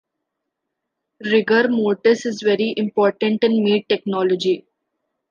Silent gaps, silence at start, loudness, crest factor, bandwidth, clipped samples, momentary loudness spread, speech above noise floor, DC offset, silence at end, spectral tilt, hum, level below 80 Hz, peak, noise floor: none; 1.2 s; -18 LUFS; 16 dB; 7.4 kHz; under 0.1%; 5 LU; 61 dB; under 0.1%; 0.7 s; -5.5 dB/octave; none; -72 dBFS; -2 dBFS; -79 dBFS